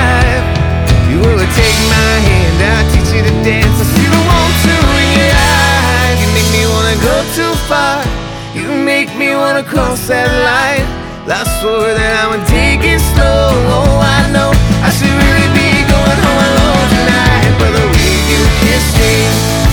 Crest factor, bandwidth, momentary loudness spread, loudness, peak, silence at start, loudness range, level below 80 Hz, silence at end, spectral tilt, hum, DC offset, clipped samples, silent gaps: 10 dB; over 20 kHz; 5 LU; -10 LUFS; 0 dBFS; 0 s; 3 LU; -16 dBFS; 0 s; -4.5 dB/octave; none; under 0.1%; under 0.1%; none